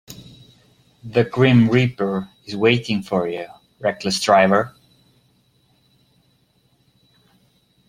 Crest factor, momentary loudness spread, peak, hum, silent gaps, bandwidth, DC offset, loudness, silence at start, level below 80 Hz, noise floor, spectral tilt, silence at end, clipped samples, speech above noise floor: 20 dB; 17 LU; -2 dBFS; none; none; 15 kHz; under 0.1%; -19 LUFS; 0.1 s; -56 dBFS; -61 dBFS; -6 dB/octave; 3.2 s; under 0.1%; 44 dB